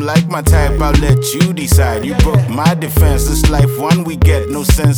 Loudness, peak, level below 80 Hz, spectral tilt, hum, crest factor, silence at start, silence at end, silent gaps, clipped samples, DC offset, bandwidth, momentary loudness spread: -13 LUFS; 0 dBFS; -16 dBFS; -5.5 dB/octave; none; 10 dB; 0 s; 0 s; none; under 0.1%; under 0.1%; over 20 kHz; 2 LU